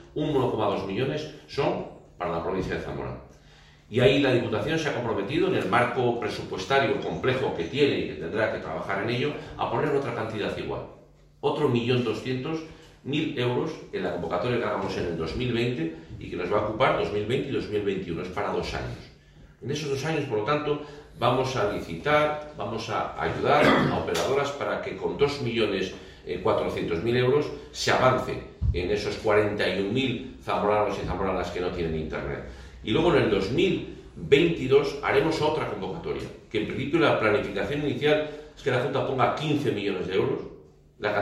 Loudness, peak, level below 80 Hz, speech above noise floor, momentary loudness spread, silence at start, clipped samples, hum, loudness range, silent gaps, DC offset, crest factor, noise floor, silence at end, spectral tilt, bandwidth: -26 LUFS; -6 dBFS; -46 dBFS; 27 dB; 11 LU; 0 s; under 0.1%; none; 4 LU; none; under 0.1%; 22 dB; -53 dBFS; 0 s; -6 dB/octave; 13 kHz